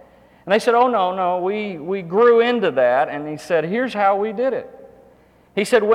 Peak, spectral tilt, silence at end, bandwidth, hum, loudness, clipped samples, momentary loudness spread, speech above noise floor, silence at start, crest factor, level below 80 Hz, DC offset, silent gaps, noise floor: -4 dBFS; -5 dB/octave; 0 s; 13.5 kHz; none; -19 LUFS; under 0.1%; 11 LU; 34 dB; 0.45 s; 16 dB; -62 dBFS; under 0.1%; none; -52 dBFS